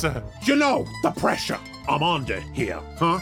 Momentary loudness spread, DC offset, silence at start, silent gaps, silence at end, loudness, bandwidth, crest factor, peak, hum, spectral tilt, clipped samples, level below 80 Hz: 9 LU; under 0.1%; 0 s; none; 0 s; -24 LUFS; 18 kHz; 18 dB; -6 dBFS; none; -5 dB/octave; under 0.1%; -44 dBFS